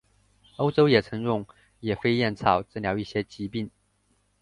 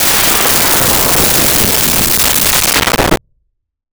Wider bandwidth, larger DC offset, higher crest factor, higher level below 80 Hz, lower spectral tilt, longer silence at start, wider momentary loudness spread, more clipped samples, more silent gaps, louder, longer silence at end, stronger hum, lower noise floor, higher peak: second, 11 kHz vs over 20 kHz; second, under 0.1% vs 0.9%; first, 22 dB vs 12 dB; second, -54 dBFS vs -28 dBFS; first, -7.5 dB/octave vs -1.5 dB/octave; first, 0.6 s vs 0 s; first, 13 LU vs 3 LU; neither; neither; second, -26 LUFS vs -8 LUFS; about the same, 0.75 s vs 0.75 s; first, 50 Hz at -55 dBFS vs none; about the same, -68 dBFS vs -65 dBFS; second, -4 dBFS vs 0 dBFS